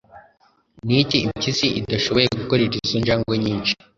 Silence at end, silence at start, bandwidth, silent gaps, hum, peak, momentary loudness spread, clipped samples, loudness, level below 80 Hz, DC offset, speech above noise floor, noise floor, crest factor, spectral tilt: 0.25 s; 0.15 s; 7.6 kHz; none; none; -2 dBFS; 4 LU; under 0.1%; -20 LUFS; -46 dBFS; under 0.1%; 39 dB; -60 dBFS; 20 dB; -5 dB/octave